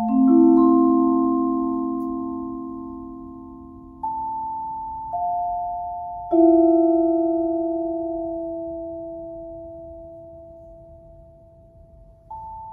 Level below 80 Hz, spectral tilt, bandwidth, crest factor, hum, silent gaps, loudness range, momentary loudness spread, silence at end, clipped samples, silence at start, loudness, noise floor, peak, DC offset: -52 dBFS; -12.5 dB/octave; 1.4 kHz; 16 dB; none; none; 17 LU; 24 LU; 0 s; under 0.1%; 0 s; -21 LUFS; -49 dBFS; -6 dBFS; under 0.1%